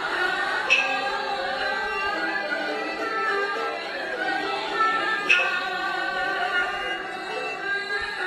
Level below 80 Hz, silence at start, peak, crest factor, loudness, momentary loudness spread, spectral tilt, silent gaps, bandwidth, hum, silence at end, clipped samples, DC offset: -60 dBFS; 0 s; -4 dBFS; 22 dB; -24 LUFS; 9 LU; -2 dB/octave; none; 14 kHz; none; 0 s; under 0.1%; under 0.1%